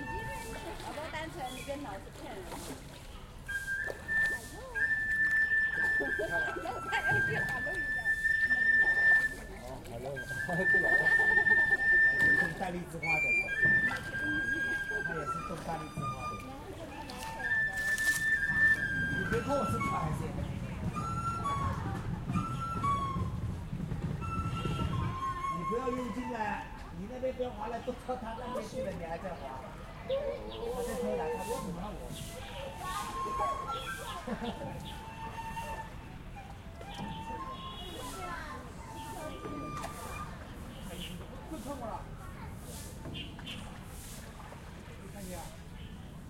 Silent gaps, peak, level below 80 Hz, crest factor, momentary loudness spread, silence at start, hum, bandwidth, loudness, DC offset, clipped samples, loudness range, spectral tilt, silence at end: none; -16 dBFS; -50 dBFS; 18 dB; 19 LU; 0 s; none; 16.5 kHz; -32 LUFS; under 0.1%; under 0.1%; 16 LU; -4.5 dB/octave; 0 s